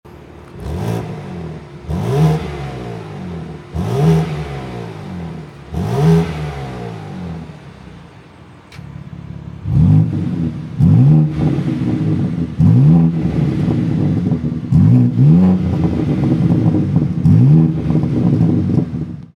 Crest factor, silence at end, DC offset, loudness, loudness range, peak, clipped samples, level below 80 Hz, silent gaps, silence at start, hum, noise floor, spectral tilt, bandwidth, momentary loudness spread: 14 dB; 0.1 s; under 0.1%; -14 LUFS; 8 LU; 0 dBFS; under 0.1%; -36 dBFS; none; 0.05 s; none; -40 dBFS; -9.5 dB/octave; 7 kHz; 18 LU